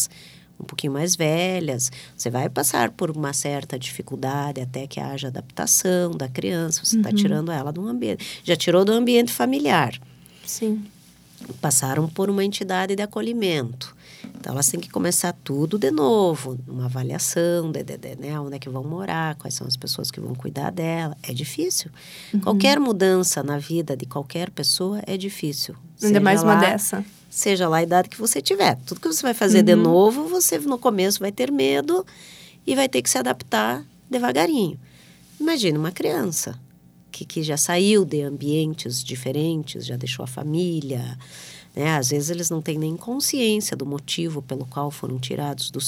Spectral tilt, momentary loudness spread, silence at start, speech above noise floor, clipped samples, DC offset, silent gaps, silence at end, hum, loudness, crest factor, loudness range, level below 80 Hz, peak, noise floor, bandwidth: -4 dB/octave; 13 LU; 0 s; 27 dB; under 0.1%; under 0.1%; none; 0 s; none; -22 LUFS; 22 dB; 7 LU; -64 dBFS; -2 dBFS; -49 dBFS; 17 kHz